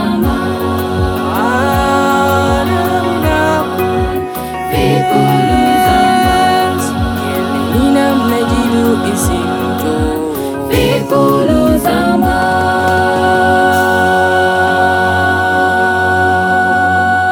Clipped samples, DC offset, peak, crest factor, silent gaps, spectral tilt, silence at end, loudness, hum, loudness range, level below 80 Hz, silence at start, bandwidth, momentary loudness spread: under 0.1%; under 0.1%; 0 dBFS; 12 dB; none; -5.5 dB/octave; 0 s; -12 LUFS; none; 2 LU; -28 dBFS; 0 s; 19 kHz; 6 LU